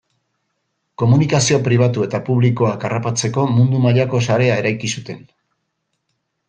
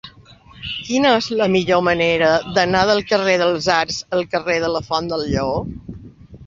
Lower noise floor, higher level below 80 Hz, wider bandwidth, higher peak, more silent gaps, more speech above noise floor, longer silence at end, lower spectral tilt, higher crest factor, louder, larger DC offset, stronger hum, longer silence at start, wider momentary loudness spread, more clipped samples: first, -72 dBFS vs -45 dBFS; second, -54 dBFS vs -44 dBFS; first, 9.6 kHz vs 7.6 kHz; about the same, -2 dBFS vs -2 dBFS; neither; first, 57 dB vs 28 dB; first, 1.3 s vs 0 s; about the same, -5.5 dB/octave vs -4.5 dB/octave; about the same, 16 dB vs 18 dB; about the same, -16 LUFS vs -18 LUFS; neither; neither; first, 1 s vs 0.05 s; second, 8 LU vs 11 LU; neither